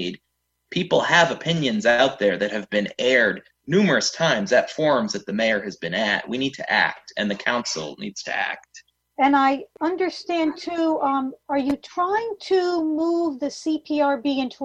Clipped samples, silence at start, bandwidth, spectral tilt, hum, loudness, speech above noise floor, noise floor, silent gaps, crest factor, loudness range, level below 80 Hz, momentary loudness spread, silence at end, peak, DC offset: under 0.1%; 0 s; 9 kHz; -4 dB/octave; none; -22 LUFS; 53 dB; -74 dBFS; none; 18 dB; 4 LU; -62 dBFS; 9 LU; 0 s; -4 dBFS; under 0.1%